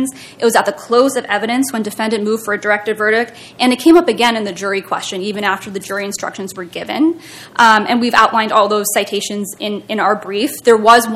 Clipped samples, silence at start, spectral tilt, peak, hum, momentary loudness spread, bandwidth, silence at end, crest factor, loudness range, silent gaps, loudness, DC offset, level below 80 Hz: 0.4%; 0 s; -3 dB/octave; 0 dBFS; none; 13 LU; 16.5 kHz; 0 s; 14 dB; 3 LU; none; -15 LUFS; under 0.1%; -56 dBFS